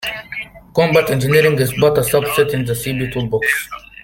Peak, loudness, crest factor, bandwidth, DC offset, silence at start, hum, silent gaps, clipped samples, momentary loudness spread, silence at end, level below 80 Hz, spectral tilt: 0 dBFS; -16 LUFS; 16 dB; 17 kHz; under 0.1%; 0 s; none; none; under 0.1%; 12 LU; 0.25 s; -44 dBFS; -5 dB/octave